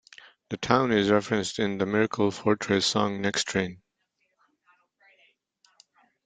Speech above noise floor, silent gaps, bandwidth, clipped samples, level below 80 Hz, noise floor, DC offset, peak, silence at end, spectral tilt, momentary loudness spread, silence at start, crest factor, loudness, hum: 51 dB; none; 9.6 kHz; under 0.1%; -62 dBFS; -76 dBFS; under 0.1%; -4 dBFS; 2.5 s; -4.5 dB/octave; 7 LU; 0.5 s; 24 dB; -25 LUFS; none